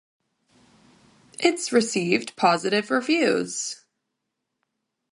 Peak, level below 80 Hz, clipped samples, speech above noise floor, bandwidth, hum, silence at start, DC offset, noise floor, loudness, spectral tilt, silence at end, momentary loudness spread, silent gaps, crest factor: -4 dBFS; -76 dBFS; under 0.1%; 58 dB; 11.5 kHz; none; 1.4 s; under 0.1%; -81 dBFS; -23 LUFS; -3.5 dB/octave; 1.35 s; 10 LU; none; 22 dB